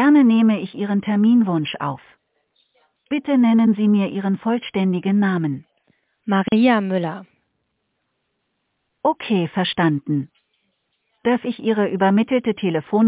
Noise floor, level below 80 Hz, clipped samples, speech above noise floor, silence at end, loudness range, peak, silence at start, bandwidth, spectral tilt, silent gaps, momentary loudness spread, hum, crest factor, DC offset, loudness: -73 dBFS; -64 dBFS; under 0.1%; 54 dB; 0 s; 5 LU; -4 dBFS; 0 s; 4 kHz; -11 dB/octave; none; 11 LU; none; 16 dB; under 0.1%; -19 LUFS